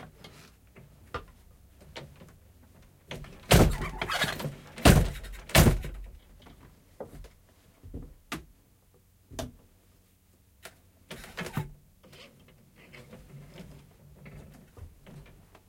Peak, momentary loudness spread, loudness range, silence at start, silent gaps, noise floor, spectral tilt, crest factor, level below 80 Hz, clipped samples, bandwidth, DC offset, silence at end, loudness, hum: -4 dBFS; 29 LU; 23 LU; 0 s; none; -63 dBFS; -5 dB/octave; 28 dB; -38 dBFS; under 0.1%; 16.5 kHz; under 0.1%; 0.5 s; -27 LUFS; none